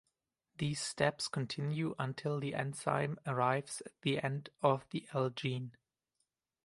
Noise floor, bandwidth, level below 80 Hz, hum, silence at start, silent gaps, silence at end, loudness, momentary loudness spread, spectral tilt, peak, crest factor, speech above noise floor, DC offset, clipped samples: -86 dBFS; 11.5 kHz; -72 dBFS; none; 0.6 s; none; 0.95 s; -37 LUFS; 6 LU; -5 dB/octave; -14 dBFS; 22 dB; 49 dB; under 0.1%; under 0.1%